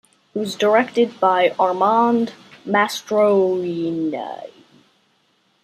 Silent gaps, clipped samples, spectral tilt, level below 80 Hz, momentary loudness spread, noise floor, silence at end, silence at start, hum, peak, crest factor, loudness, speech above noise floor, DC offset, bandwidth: none; under 0.1%; -5 dB/octave; -70 dBFS; 12 LU; -63 dBFS; 1.15 s; 0.35 s; none; -2 dBFS; 18 dB; -19 LUFS; 45 dB; under 0.1%; 15 kHz